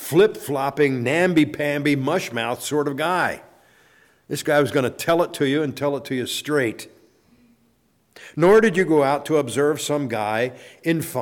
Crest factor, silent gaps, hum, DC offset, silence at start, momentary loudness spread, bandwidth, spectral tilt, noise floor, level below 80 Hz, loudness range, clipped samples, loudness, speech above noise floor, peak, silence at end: 14 dB; none; none; under 0.1%; 0 s; 8 LU; 19 kHz; -5 dB/octave; -63 dBFS; -60 dBFS; 4 LU; under 0.1%; -21 LUFS; 43 dB; -6 dBFS; 0 s